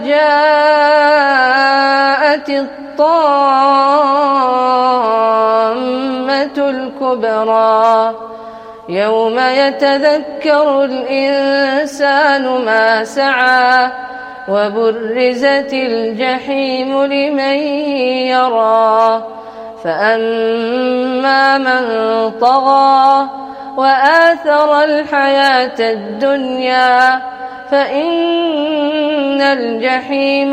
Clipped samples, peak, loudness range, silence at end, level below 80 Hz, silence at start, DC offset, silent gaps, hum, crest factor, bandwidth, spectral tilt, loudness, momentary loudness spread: under 0.1%; 0 dBFS; 4 LU; 0 s; -60 dBFS; 0 s; under 0.1%; none; none; 12 dB; 10 kHz; -4 dB/octave; -12 LUFS; 8 LU